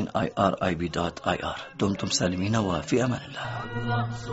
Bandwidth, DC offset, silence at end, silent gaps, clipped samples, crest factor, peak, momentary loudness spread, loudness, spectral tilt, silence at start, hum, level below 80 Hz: 8 kHz; under 0.1%; 0 s; none; under 0.1%; 20 dB; -6 dBFS; 8 LU; -27 LUFS; -5 dB/octave; 0 s; none; -50 dBFS